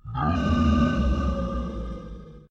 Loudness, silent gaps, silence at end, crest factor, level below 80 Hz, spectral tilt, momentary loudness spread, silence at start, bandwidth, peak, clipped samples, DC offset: -25 LUFS; none; 0.1 s; 14 dB; -30 dBFS; -8 dB/octave; 17 LU; 0.05 s; 7.6 kHz; -10 dBFS; under 0.1%; under 0.1%